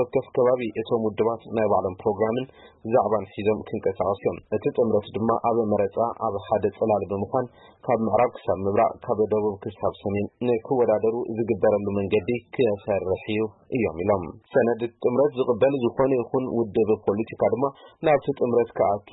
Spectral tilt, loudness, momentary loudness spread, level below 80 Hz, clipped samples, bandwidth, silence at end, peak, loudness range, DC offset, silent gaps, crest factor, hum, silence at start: -11.5 dB/octave; -24 LUFS; 6 LU; -58 dBFS; under 0.1%; 4.1 kHz; 0.15 s; -8 dBFS; 2 LU; under 0.1%; none; 14 dB; none; 0 s